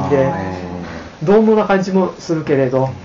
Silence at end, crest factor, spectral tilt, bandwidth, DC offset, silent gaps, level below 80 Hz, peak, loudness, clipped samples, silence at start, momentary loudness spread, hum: 0 s; 12 dB; -7 dB/octave; 7.4 kHz; under 0.1%; none; -46 dBFS; -2 dBFS; -15 LUFS; under 0.1%; 0 s; 15 LU; none